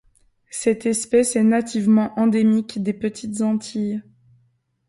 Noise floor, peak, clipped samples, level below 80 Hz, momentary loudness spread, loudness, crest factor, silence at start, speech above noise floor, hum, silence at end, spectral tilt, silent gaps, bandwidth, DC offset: -64 dBFS; -6 dBFS; under 0.1%; -60 dBFS; 9 LU; -20 LUFS; 14 dB; 0.55 s; 45 dB; none; 0.85 s; -5.5 dB/octave; none; 11.5 kHz; under 0.1%